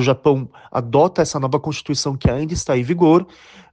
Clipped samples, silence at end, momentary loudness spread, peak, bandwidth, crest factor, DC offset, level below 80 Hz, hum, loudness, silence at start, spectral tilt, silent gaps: under 0.1%; 0.45 s; 8 LU; -2 dBFS; 9.6 kHz; 16 dB; under 0.1%; -38 dBFS; none; -18 LUFS; 0 s; -6 dB/octave; none